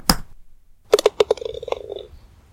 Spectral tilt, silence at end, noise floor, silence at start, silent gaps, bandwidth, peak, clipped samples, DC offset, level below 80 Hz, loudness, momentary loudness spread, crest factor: -3.5 dB/octave; 0.35 s; -45 dBFS; 0.05 s; none; 17 kHz; 0 dBFS; under 0.1%; under 0.1%; -38 dBFS; -21 LUFS; 14 LU; 22 dB